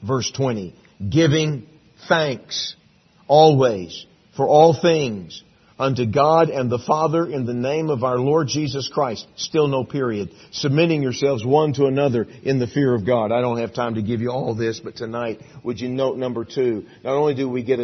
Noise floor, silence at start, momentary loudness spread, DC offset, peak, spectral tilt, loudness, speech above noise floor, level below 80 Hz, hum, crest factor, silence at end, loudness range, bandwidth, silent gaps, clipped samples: -55 dBFS; 0 s; 13 LU; under 0.1%; -2 dBFS; -6 dB/octave; -20 LUFS; 35 dB; -58 dBFS; none; 18 dB; 0 s; 6 LU; 6.4 kHz; none; under 0.1%